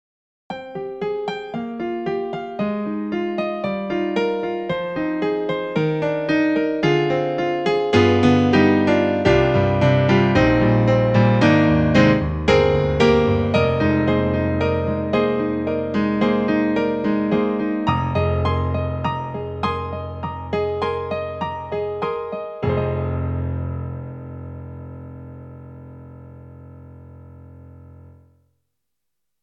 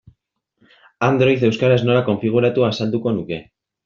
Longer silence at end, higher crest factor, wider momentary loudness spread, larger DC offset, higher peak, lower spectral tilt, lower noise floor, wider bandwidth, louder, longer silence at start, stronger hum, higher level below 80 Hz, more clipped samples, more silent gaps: first, 1.4 s vs 0.45 s; about the same, 20 dB vs 16 dB; first, 15 LU vs 8 LU; neither; about the same, 0 dBFS vs -2 dBFS; first, -7.5 dB/octave vs -6 dB/octave; first, -82 dBFS vs -70 dBFS; first, 8.4 kHz vs 7.2 kHz; about the same, -20 LUFS vs -18 LUFS; second, 0.5 s vs 1 s; neither; first, -38 dBFS vs -56 dBFS; neither; neither